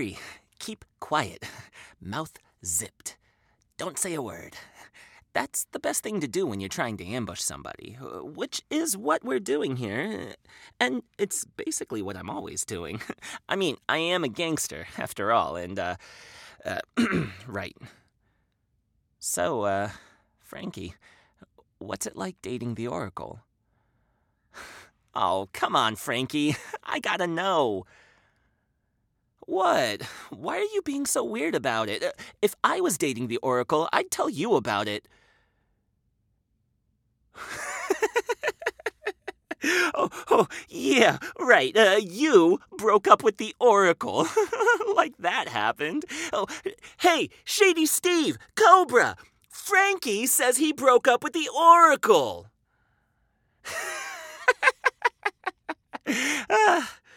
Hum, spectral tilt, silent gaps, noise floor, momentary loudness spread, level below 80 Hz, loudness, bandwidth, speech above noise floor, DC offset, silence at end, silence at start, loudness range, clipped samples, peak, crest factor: none; -3 dB/octave; none; -74 dBFS; 19 LU; -66 dBFS; -25 LUFS; 19.5 kHz; 48 dB; under 0.1%; 0.25 s; 0 s; 12 LU; under 0.1%; -2 dBFS; 26 dB